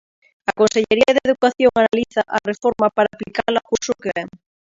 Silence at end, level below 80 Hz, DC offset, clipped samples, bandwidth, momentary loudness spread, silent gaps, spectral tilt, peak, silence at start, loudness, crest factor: 0.5 s; -54 dBFS; under 0.1%; under 0.1%; 7.8 kHz; 10 LU; none; -4 dB/octave; 0 dBFS; 0.5 s; -18 LUFS; 18 dB